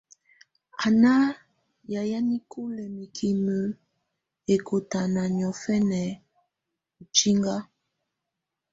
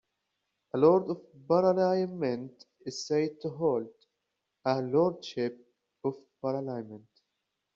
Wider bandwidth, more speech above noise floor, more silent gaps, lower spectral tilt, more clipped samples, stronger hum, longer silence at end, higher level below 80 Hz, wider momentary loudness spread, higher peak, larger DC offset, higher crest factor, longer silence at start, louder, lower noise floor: about the same, 8 kHz vs 7.4 kHz; first, 60 dB vs 55 dB; neither; second, -4.5 dB/octave vs -6 dB/octave; neither; neither; first, 1.1 s vs 0.75 s; first, -64 dBFS vs -74 dBFS; about the same, 16 LU vs 15 LU; first, -4 dBFS vs -10 dBFS; neither; about the same, 22 dB vs 20 dB; about the same, 0.75 s vs 0.75 s; first, -25 LUFS vs -30 LUFS; about the same, -85 dBFS vs -83 dBFS